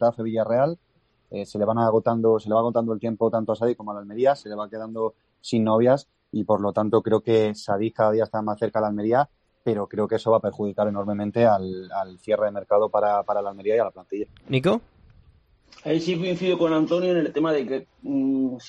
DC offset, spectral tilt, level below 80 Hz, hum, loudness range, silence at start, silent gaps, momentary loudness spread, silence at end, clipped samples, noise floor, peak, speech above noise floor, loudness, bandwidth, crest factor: under 0.1%; -7.5 dB/octave; -62 dBFS; none; 2 LU; 0 s; none; 11 LU; 0 s; under 0.1%; -58 dBFS; -6 dBFS; 35 dB; -24 LUFS; 9.8 kHz; 16 dB